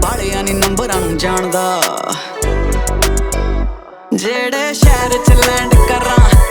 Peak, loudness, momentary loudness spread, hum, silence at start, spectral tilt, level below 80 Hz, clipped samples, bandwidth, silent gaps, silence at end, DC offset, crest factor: 0 dBFS; -14 LUFS; 9 LU; none; 0 s; -4.5 dB/octave; -16 dBFS; under 0.1%; over 20 kHz; none; 0 s; under 0.1%; 12 dB